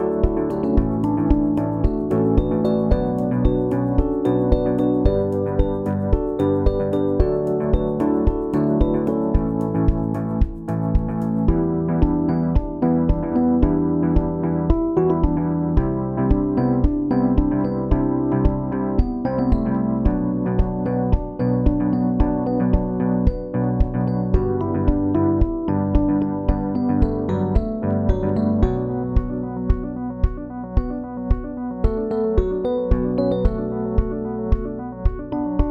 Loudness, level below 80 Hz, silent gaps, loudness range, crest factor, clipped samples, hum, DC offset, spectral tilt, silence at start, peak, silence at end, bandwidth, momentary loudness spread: -21 LUFS; -24 dBFS; none; 3 LU; 16 dB; under 0.1%; none; under 0.1%; -11 dB/octave; 0 s; -2 dBFS; 0 s; 4.9 kHz; 5 LU